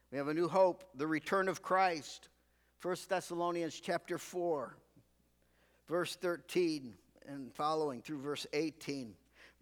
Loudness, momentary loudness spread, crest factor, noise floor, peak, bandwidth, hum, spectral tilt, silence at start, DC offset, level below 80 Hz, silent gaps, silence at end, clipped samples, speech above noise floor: -37 LUFS; 14 LU; 20 dB; -73 dBFS; -18 dBFS; 19.5 kHz; 60 Hz at -75 dBFS; -4.5 dB/octave; 0.1 s; under 0.1%; -76 dBFS; none; 0.15 s; under 0.1%; 37 dB